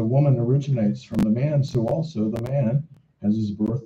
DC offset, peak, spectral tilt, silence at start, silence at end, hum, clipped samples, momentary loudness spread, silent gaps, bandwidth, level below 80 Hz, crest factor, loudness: under 0.1%; -8 dBFS; -9.5 dB/octave; 0 s; 0 s; none; under 0.1%; 7 LU; none; 7.4 kHz; -52 dBFS; 14 dB; -23 LUFS